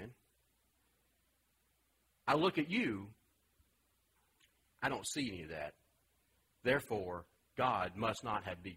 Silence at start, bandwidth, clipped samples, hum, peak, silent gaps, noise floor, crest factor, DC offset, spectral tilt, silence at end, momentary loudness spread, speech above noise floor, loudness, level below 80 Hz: 0 s; 16 kHz; under 0.1%; none; -18 dBFS; none; -78 dBFS; 22 dB; under 0.1%; -4.5 dB/octave; 0 s; 14 LU; 40 dB; -38 LUFS; -70 dBFS